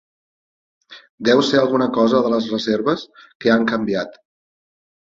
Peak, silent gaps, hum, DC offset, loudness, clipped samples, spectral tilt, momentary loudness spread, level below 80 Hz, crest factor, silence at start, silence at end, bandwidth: -2 dBFS; 1.10-1.18 s, 3.35-3.40 s; none; under 0.1%; -18 LUFS; under 0.1%; -5.5 dB/octave; 8 LU; -60 dBFS; 18 dB; 0.9 s; 0.95 s; 7.8 kHz